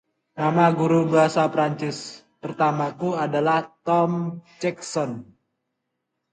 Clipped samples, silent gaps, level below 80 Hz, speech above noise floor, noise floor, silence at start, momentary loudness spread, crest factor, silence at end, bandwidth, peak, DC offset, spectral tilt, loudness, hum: under 0.1%; none; -68 dBFS; 57 dB; -79 dBFS; 0.35 s; 16 LU; 18 dB; 1.1 s; 9.4 kHz; -4 dBFS; under 0.1%; -6.5 dB/octave; -22 LUFS; none